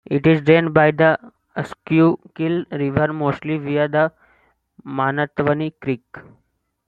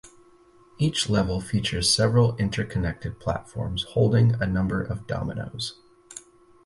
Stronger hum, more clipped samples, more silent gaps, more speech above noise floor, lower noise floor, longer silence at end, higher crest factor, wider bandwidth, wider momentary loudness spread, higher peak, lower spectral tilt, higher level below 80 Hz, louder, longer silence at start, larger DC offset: neither; neither; neither; first, 42 dB vs 31 dB; first, -60 dBFS vs -55 dBFS; first, 0.65 s vs 0.45 s; about the same, 18 dB vs 18 dB; second, 7.4 kHz vs 11.5 kHz; about the same, 13 LU vs 13 LU; first, -2 dBFS vs -6 dBFS; first, -9 dB/octave vs -5 dB/octave; second, -54 dBFS vs -42 dBFS; first, -19 LUFS vs -25 LUFS; about the same, 0.1 s vs 0.05 s; neither